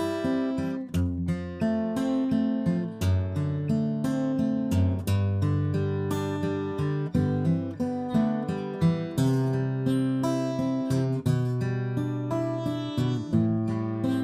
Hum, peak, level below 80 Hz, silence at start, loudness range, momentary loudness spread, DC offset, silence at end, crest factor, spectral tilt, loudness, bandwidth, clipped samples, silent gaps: none; -12 dBFS; -52 dBFS; 0 s; 1 LU; 4 LU; under 0.1%; 0 s; 14 dB; -8 dB/octave; -27 LUFS; 15.5 kHz; under 0.1%; none